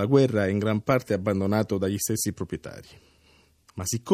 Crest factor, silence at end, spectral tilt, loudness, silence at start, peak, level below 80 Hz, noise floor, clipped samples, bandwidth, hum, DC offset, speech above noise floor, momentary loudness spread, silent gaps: 18 dB; 0 s; -5.5 dB/octave; -26 LUFS; 0 s; -8 dBFS; -60 dBFS; -60 dBFS; under 0.1%; 15.5 kHz; none; under 0.1%; 35 dB; 14 LU; none